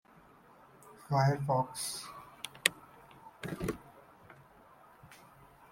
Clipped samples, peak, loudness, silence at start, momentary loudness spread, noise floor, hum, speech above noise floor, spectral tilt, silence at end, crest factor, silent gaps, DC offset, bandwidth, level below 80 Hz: under 0.1%; -2 dBFS; -34 LUFS; 0.85 s; 27 LU; -60 dBFS; none; 28 dB; -4 dB/octave; 0.55 s; 36 dB; none; under 0.1%; 16.5 kHz; -64 dBFS